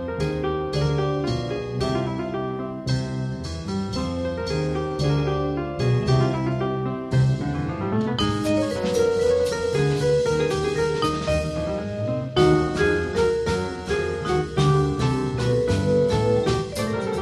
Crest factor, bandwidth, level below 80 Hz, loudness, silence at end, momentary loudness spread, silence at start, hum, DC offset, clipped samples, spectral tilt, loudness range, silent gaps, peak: 16 dB; 13 kHz; -38 dBFS; -23 LUFS; 0 s; 7 LU; 0 s; none; under 0.1%; under 0.1%; -6.5 dB/octave; 4 LU; none; -8 dBFS